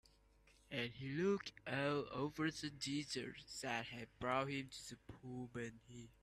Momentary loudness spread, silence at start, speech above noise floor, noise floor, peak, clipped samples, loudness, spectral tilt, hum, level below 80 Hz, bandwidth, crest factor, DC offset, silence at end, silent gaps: 12 LU; 0.45 s; 27 dB; -71 dBFS; -24 dBFS; under 0.1%; -44 LUFS; -4.5 dB/octave; none; -72 dBFS; 14 kHz; 22 dB; under 0.1%; 0.1 s; none